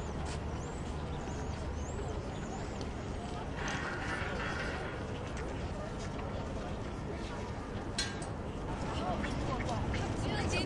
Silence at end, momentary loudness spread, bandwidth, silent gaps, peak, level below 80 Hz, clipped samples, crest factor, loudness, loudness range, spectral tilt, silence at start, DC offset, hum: 0 s; 5 LU; 11.5 kHz; none; -20 dBFS; -44 dBFS; under 0.1%; 16 dB; -38 LUFS; 3 LU; -5 dB/octave; 0 s; under 0.1%; none